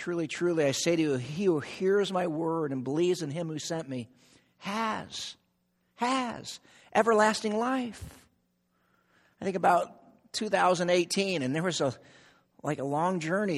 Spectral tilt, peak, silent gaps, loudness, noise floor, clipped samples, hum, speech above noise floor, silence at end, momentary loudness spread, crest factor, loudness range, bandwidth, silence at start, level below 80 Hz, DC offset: -4.5 dB/octave; -10 dBFS; none; -29 LUFS; -74 dBFS; under 0.1%; none; 45 dB; 0 s; 14 LU; 20 dB; 5 LU; 13.5 kHz; 0 s; -66 dBFS; under 0.1%